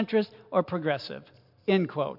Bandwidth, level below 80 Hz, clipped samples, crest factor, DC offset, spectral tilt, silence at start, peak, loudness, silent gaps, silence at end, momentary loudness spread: 5.8 kHz; -74 dBFS; under 0.1%; 18 dB; under 0.1%; -8.5 dB/octave; 0 s; -10 dBFS; -29 LUFS; none; 0 s; 11 LU